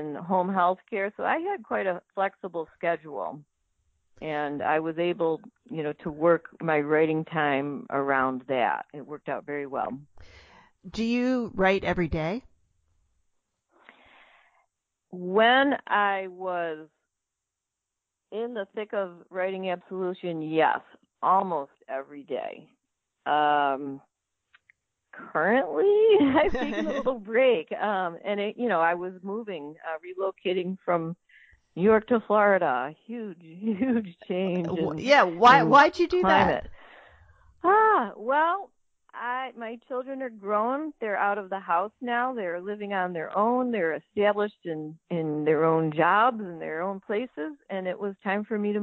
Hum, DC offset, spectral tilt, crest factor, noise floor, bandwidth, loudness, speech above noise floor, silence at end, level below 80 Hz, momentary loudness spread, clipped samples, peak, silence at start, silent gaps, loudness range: none; under 0.1%; -6.5 dB/octave; 20 dB; -85 dBFS; 8 kHz; -26 LUFS; 59 dB; 0 s; -56 dBFS; 15 LU; under 0.1%; -6 dBFS; 0 s; none; 9 LU